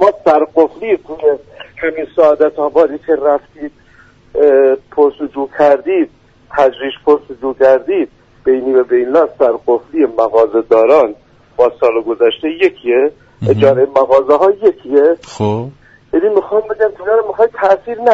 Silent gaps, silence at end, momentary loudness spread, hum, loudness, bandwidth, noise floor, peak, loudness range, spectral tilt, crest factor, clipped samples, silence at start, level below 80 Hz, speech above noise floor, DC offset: none; 0 s; 10 LU; none; -13 LUFS; 7.8 kHz; -45 dBFS; 0 dBFS; 2 LU; -7.5 dB/octave; 12 dB; under 0.1%; 0 s; -50 dBFS; 33 dB; under 0.1%